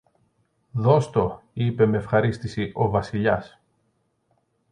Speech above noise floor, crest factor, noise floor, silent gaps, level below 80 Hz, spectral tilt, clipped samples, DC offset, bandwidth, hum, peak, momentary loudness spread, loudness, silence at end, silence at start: 48 dB; 20 dB; -70 dBFS; none; -50 dBFS; -8 dB/octave; under 0.1%; under 0.1%; 9.8 kHz; none; -4 dBFS; 9 LU; -23 LUFS; 1.25 s; 0.75 s